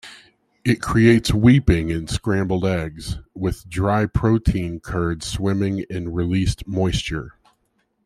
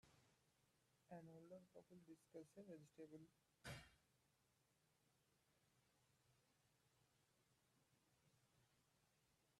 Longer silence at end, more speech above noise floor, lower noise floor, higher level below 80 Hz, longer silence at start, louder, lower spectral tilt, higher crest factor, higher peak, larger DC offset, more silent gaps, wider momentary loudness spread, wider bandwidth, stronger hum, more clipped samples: first, 0.75 s vs 0 s; first, 48 dB vs 22 dB; second, -68 dBFS vs -85 dBFS; first, -34 dBFS vs -88 dBFS; about the same, 0.05 s vs 0.05 s; first, -21 LUFS vs -64 LUFS; first, -6.5 dB/octave vs -5 dB/octave; second, 18 dB vs 24 dB; first, -2 dBFS vs -44 dBFS; neither; neither; first, 12 LU vs 8 LU; first, 14.5 kHz vs 12.5 kHz; neither; neither